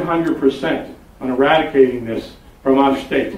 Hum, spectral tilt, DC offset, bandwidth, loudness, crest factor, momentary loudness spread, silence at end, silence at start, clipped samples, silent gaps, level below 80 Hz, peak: none; -6.5 dB/octave; under 0.1%; 13.5 kHz; -17 LUFS; 16 dB; 12 LU; 0 s; 0 s; under 0.1%; none; -46 dBFS; -2 dBFS